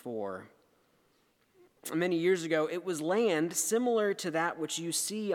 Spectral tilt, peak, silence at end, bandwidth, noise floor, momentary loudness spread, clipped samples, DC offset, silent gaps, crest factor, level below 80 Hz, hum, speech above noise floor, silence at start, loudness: -3.5 dB/octave; -16 dBFS; 0 s; 18.5 kHz; -70 dBFS; 10 LU; under 0.1%; under 0.1%; none; 16 dB; -86 dBFS; none; 40 dB; 0.05 s; -31 LUFS